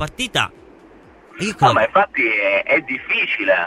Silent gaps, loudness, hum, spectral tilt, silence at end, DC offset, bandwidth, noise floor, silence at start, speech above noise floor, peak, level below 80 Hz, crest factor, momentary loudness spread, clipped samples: none; -17 LUFS; none; -4 dB/octave; 0 s; under 0.1%; 13.5 kHz; -46 dBFS; 0 s; 28 dB; 0 dBFS; -52 dBFS; 18 dB; 8 LU; under 0.1%